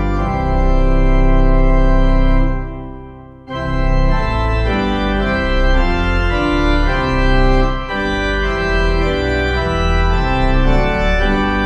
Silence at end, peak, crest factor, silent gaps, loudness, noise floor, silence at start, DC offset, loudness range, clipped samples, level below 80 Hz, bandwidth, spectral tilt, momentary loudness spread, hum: 0 s; 0 dBFS; 12 dB; none; -16 LUFS; -35 dBFS; 0 s; under 0.1%; 2 LU; under 0.1%; -16 dBFS; 6.6 kHz; -7 dB/octave; 5 LU; none